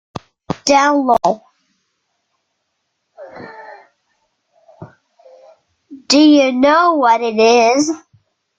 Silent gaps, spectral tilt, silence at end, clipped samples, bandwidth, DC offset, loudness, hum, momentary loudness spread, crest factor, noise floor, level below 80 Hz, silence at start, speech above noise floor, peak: none; -3.5 dB/octave; 0.6 s; under 0.1%; 9.2 kHz; under 0.1%; -12 LUFS; none; 24 LU; 16 dB; -71 dBFS; -58 dBFS; 0.15 s; 59 dB; 0 dBFS